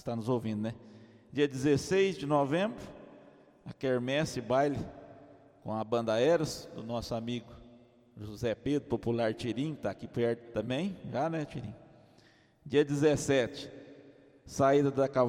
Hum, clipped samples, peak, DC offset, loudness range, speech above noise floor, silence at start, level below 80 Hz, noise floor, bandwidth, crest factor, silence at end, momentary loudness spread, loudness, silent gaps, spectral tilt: none; under 0.1%; -14 dBFS; under 0.1%; 4 LU; 32 dB; 0.05 s; -60 dBFS; -63 dBFS; 16 kHz; 18 dB; 0 s; 18 LU; -32 LUFS; none; -6 dB/octave